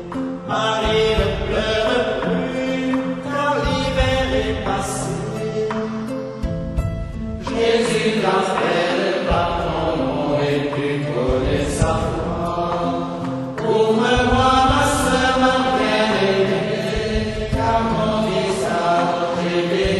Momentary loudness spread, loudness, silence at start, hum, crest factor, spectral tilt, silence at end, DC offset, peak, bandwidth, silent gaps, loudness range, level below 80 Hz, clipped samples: 8 LU; -19 LUFS; 0 s; none; 16 dB; -5 dB/octave; 0 s; under 0.1%; -4 dBFS; 13 kHz; none; 5 LU; -32 dBFS; under 0.1%